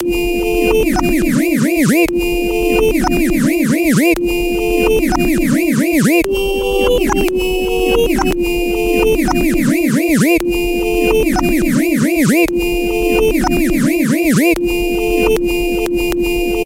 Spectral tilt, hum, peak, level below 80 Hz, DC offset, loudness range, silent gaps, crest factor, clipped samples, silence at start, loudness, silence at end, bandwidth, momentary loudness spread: -5 dB/octave; none; -2 dBFS; -26 dBFS; under 0.1%; 1 LU; none; 12 dB; under 0.1%; 0 s; -14 LUFS; 0 s; 16.5 kHz; 4 LU